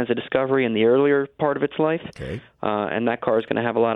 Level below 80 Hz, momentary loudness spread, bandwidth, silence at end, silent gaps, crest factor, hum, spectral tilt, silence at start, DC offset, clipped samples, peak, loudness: -54 dBFS; 10 LU; 5.8 kHz; 0 s; none; 16 dB; none; -8 dB/octave; 0 s; under 0.1%; under 0.1%; -6 dBFS; -22 LUFS